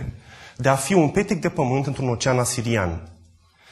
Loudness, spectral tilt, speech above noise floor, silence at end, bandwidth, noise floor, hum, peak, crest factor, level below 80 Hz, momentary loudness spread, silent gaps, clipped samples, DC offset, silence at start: -22 LUFS; -5.5 dB/octave; 33 dB; 0.6 s; 12.5 kHz; -54 dBFS; none; -2 dBFS; 20 dB; -46 dBFS; 17 LU; none; under 0.1%; under 0.1%; 0 s